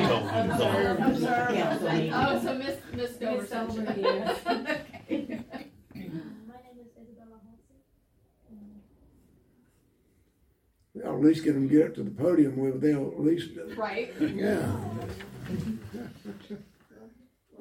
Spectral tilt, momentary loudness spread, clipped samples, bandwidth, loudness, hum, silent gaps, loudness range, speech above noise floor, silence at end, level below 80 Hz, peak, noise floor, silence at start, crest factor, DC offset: -6.5 dB/octave; 18 LU; under 0.1%; 16.5 kHz; -28 LUFS; none; none; 15 LU; 41 dB; 0.5 s; -60 dBFS; -10 dBFS; -68 dBFS; 0 s; 18 dB; under 0.1%